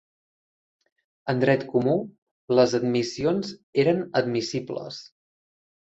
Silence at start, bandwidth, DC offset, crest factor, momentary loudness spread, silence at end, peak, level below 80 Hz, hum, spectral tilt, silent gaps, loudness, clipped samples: 1.25 s; 8 kHz; under 0.1%; 20 dB; 13 LU; 0.85 s; -6 dBFS; -64 dBFS; none; -6 dB/octave; 2.18-2.48 s, 3.63-3.73 s; -24 LUFS; under 0.1%